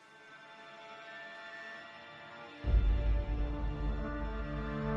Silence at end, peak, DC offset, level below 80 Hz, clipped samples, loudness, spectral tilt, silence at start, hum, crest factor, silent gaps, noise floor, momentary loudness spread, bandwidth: 0 s; -18 dBFS; under 0.1%; -36 dBFS; under 0.1%; -38 LUFS; -8 dB/octave; 0.1 s; none; 18 dB; none; -55 dBFS; 18 LU; 5.8 kHz